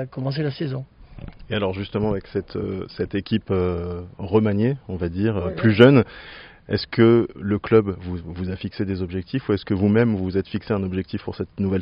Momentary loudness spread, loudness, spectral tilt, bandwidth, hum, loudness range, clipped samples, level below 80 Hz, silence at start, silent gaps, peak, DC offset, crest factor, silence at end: 14 LU; -22 LUFS; -6.5 dB/octave; 5.4 kHz; none; 7 LU; under 0.1%; -46 dBFS; 0 s; none; 0 dBFS; under 0.1%; 22 dB; 0 s